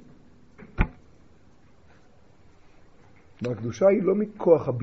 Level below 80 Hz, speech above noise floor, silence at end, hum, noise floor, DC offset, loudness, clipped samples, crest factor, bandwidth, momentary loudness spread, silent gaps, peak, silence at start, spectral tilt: -40 dBFS; 35 dB; 0 s; none; -57 dBFS; 0.2%; -24 LUFS; under 0.1%; 22 dB; 6.6 kHz; 12 LU; none; -6 dBFS; 0.6 s; -8 dB/octave